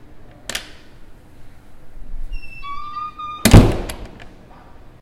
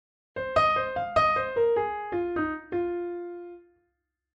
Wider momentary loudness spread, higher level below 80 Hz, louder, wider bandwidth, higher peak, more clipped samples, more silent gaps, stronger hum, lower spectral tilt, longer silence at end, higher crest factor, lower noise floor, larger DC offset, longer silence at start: first, 28 LU vs 15 LU; first, -26 dBFS vs -56 dBFS; first, -17 LUFS vs -27 LUFS; first, 16.5 kHz vs 8.8 kHz; first, 0 dBFS vs -10 dBFS; first, 0.3% vs under 0.1%; neither; neither; about the same, -5.5 dB/octave vs -6 dB/octave; second, 0.15 s vs 0.75 s; about the same, 20 dB vs 18 dB; second, -41 dBFS vs -79 dBFS; neither; second, 0.05 s vs 0.35 s